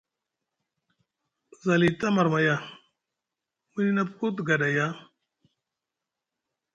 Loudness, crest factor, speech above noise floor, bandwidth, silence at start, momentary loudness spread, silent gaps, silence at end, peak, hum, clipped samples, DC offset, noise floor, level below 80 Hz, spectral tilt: -25 LUFS; 20 dB; 62 dB; 9 kHz; 1.65 s; 11 LU; none; 1.75 s; -8 dBFS; none; under 0.1%; under 0.1%; -87 dBFS; -68 dBFS; -6.5 dB/octave